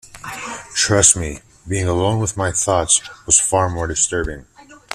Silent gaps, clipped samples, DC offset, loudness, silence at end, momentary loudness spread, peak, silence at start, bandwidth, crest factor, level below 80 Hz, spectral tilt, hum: none; under 0.1%; under 0.1%; -16 LUFS; 0 s; 17 LU; 0 dBFS; 0.05 s; 14 kHz; 20 dB; -40 dBFS; -3 dB/octave; none